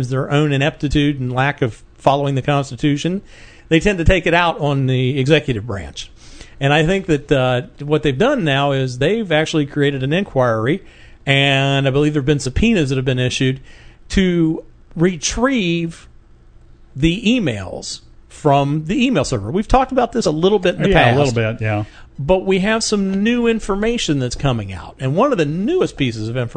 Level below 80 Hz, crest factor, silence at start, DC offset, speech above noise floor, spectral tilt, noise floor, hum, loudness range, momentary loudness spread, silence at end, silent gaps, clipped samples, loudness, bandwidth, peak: -32 dBFS; 16 dB; 0 s; under 0.1%; 28 dB; -5.5 dB/octave; -44 dBFS; none; 3 LU; 9 LU; 0 s; none; under 0.1%; -17 LUFS; 9.4 kHz; 0 dBFS